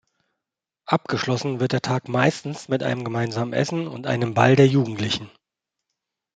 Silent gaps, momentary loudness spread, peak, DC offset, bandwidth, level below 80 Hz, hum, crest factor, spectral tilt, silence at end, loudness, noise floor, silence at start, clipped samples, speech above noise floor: none; 10 LU; 0 dBFS; under 0.1%; 9.2 kHz; -62 dBFS; none; 22 dB; -6 dB/octave; 1.1 s; -22 LUFS; -86 dBFS; 0.85 s; under 0.1%; 64 dB